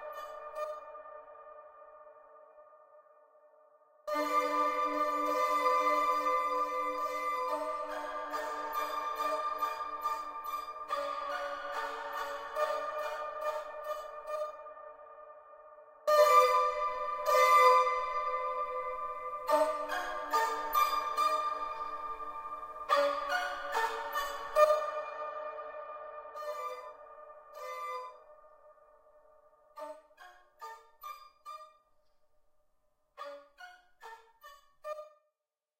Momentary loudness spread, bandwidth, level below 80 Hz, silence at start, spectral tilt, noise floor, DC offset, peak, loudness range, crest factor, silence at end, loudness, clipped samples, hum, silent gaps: 22 LU; 16 kHz; -68 dBFS; 0 s; -1 dB/octave; -90 dBFS; under 0.1%; -12 dBFS; 23 LU; 22 dB; 0.7 s; -32 LUFS; under 0.1%; none; none